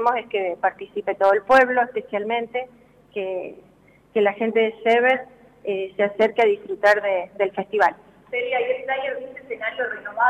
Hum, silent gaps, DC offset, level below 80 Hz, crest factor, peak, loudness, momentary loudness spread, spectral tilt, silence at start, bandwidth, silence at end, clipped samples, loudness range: none; none; under 0.1%; -64 dBFS; 16 dB; -6 dBFS; -22 LUFS; 12 LU; -5 dB/octave; 0 s; 11 kHz; 0 s; under 0.1%; 3 LU